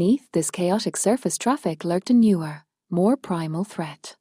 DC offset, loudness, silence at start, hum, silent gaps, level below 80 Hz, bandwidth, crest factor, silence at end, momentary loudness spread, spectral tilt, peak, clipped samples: under 0.1%; -23 LUFS; 0 s; none; none; -66 dBFS; 15.5 kHz; 14 dB; 0.1 s; 12 LU; -5.5 dB/octave; -8 dBFS; under 0.1%